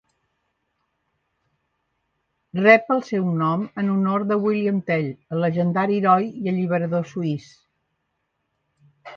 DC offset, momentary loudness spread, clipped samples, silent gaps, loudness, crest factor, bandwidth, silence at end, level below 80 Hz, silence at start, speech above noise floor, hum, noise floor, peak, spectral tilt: under 0.1%; 11 LU; under 0.1%; none; -21 LUFS; 22 dB; 6.8 kHz; 0 s; -68 dBFS; 2.55 s; 54 dB; none; -75 dBFS; 0 dBFS; -8.5 dB/octave